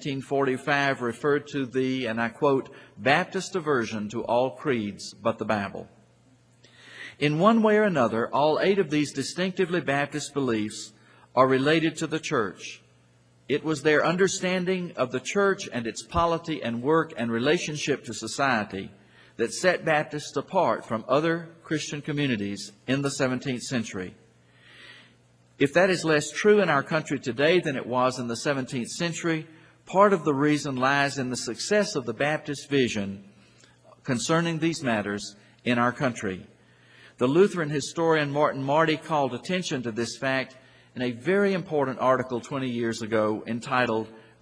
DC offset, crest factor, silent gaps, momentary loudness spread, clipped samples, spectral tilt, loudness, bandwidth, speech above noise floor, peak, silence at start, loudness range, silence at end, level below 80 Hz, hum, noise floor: under 0.1%; 22 dB; none; 10 LU; under 0.1%; -5 dB/octave; -26 LUFS; 10.5 kHz; 34 dB; -4 dBFS; 0 s; 4 LU; 0.2 s; -62 dBFS; none; -60 dBFS